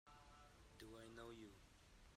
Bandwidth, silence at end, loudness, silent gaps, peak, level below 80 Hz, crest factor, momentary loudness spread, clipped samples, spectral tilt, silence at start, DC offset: 15.5 kHz; 0 s; -62 LUFS; none; -44 dBFS; -72 dBFS; 18 dB; 10 LU; under 0.1%; -4.5 dB/octave; 0.05 s; under 0.1%